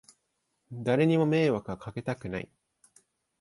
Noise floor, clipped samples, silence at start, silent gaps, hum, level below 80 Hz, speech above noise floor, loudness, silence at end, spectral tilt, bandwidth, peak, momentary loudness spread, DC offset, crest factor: -79 dBFS; under 0.1%; 0.7 s; none; none; -62 dBFS; 51 dB; -28 LUFS; 0.95 s; -7.5 dB/octave; 11.5 kHz; -12 dBFS; 15 LU; under 0.1%; 18 dB